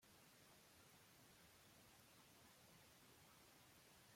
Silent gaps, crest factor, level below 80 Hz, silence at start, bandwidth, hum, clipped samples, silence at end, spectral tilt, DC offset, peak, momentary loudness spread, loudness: none; 14 dB; -88 dBFS; 0 s; 16.5 kHz; none; under 0.1%; 0 s; -2.5 dB/octave; under 0.1%; -56 dBFS; 0 LU; -68 LUFS